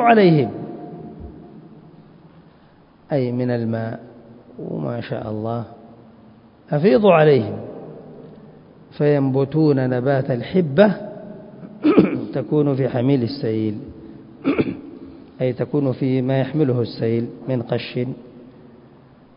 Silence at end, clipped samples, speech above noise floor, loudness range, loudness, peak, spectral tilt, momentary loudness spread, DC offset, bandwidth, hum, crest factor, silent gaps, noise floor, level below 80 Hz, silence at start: 0.85 s; under 0.1%; 32 dB; 8 LU; -19 LUFS; 0 dBFS; -12.5 dB/octave; 22 LU; under 0.1%; 5.4 kHz; none; 20 dB; none; -50 dBFS; -54 dBFS; 0 s